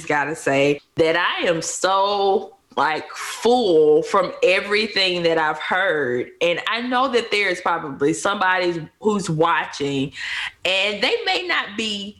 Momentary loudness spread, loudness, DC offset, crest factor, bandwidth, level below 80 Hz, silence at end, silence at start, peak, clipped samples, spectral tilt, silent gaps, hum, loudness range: 7 LU; -20 LUFS; under 0.1%; 16 dB; 12.5 kHz; -60 dBFS; 0.1 s; 0 s; -6 dBFS; under 0.1%; -3.5 dB/octave; none; none; 3 LU